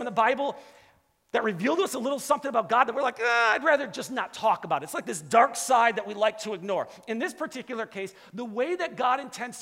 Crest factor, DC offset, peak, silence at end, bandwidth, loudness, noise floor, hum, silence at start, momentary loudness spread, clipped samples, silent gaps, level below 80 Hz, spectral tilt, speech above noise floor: 22 dB; under 0.1%; -6 dBFS; 0 s; 16 kHz; -26 LUFS; -63 dBFS; none; 0 s; 12 LU; under 0.1%; none; -74 dBFS; -3 dB/octave; 37 dB